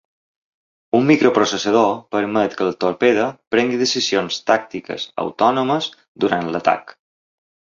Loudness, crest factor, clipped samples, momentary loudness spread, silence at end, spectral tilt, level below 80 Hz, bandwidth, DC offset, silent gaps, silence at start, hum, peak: -18 LUFS; 18 dB; under 0.1%; 9 LU; 0.85 s; -4.5 dB/octave; -60 dBFS; 7.6 kHz; under 0.1%; 3.47-3.51 s, 6.08-6.15 s; 0.95 s; none; 0 dBFS